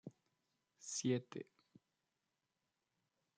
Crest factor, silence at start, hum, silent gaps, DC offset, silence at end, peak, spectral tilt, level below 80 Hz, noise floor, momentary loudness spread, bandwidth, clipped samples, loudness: 24 dB; 0.05 s; none; none; under 0.1%; 1.95 s; -26 dBFS; -4.5 dB/octave; under -90 dBFS; -89 dBFS; 20 LU; 9.6 kHz; under 0.1%; -43 LUFS